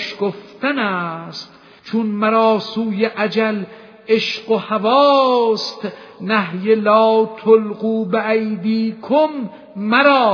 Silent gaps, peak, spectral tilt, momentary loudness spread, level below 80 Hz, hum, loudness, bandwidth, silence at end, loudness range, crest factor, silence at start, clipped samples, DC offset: none; 0 dBFS; -6 dB/octave; 16 LU; -68 dBFS; none; -17 LUFS; 5.4 kHz; 0 s; 4 LU; 16 dB; 0 s; under 0.1%; under 0.1%